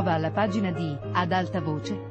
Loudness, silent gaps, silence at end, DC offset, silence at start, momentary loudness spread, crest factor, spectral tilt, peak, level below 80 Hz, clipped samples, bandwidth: -27 LUFS; none; 0 s; under 0.1%; 0 s; 5 LU; 18 dB; -7 dB/octave; -10 dBFS; -56 dBFS; under 0.1%; 8.4 kHz